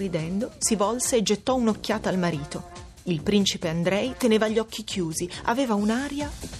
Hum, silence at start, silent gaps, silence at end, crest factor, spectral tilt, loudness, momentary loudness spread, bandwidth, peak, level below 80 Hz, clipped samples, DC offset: none; 0 s; none; 0 s; 18 dB; -4.5 dB/octave; -25 LUFS; 8 LU; 14.5 kHz; -8 dBFS; -48 dBFS; under 0.1%; under 0.1%